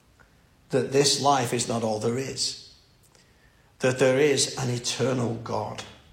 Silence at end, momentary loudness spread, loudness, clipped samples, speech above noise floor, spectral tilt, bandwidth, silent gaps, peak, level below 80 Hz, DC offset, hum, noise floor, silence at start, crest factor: 0.2 s; 11 LU; -25 LUFS; under 0.1%; 34 dB; -3.5 dB/octave; 16.5 kHz; none; -8 dBFS; -62 dBFS; under 0.1%; none; -59 dBFS; 0.7 s; 20 dB